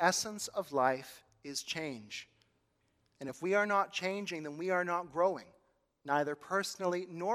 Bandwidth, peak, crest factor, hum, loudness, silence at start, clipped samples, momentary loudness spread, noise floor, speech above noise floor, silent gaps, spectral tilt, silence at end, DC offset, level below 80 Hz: 16 kHz; -12 dBFS; 24 dB; none; -35 LUFS; 0 s; under 0.1%; 14 LU; -76 dBFS; 42 dB; none; -3 dB/octave; 0 s; under 0.1%; -80 dBFS